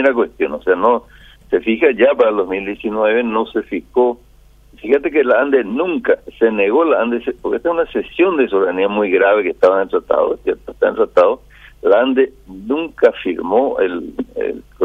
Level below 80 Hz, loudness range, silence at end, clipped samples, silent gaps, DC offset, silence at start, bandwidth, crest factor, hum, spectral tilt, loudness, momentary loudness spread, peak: -48 dBFS; 2 LU; 0 s; under 0.1%; none; under 0.1%; 0 s; 4.8 kHz; 14 dB; none; -7 dB/octave; -16 LUFS; 9 LU; 0 dBFS